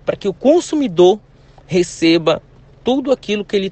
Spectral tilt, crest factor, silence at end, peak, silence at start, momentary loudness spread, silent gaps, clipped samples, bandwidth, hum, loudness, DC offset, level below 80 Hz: -5.5 dB/octave; 16 dB; 0 s; 0 dBFS; 0.05 s; 9 LU; none; under 0.1%; 8.8 kHz; none; -16 LUFS; under 0.1%; -48 dBFS